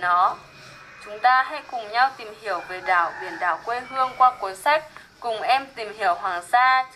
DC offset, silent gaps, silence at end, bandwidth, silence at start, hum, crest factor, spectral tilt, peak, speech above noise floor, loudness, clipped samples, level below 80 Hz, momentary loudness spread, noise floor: under 0.1%; none; 0.05 s; 13 kHz; 0 s; none; 18 dB; -2 dB/octave; -6 dBFS; 22 dB; -22 LUFS; under 0.1%; -64 dBFS; 15 LU; -44 dBFS